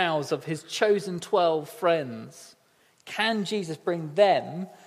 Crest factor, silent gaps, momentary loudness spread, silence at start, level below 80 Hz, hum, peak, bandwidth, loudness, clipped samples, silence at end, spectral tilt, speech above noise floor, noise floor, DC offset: 20 dB; none; 14 LU; 0 s; -78 dBFS; none; -6 dBFS; 15.5 kHz; -26 LUFS; under 0.1%; 0.1 s; -4.5 dB/octave; 37 dB; -63 dBFS; under 0.1%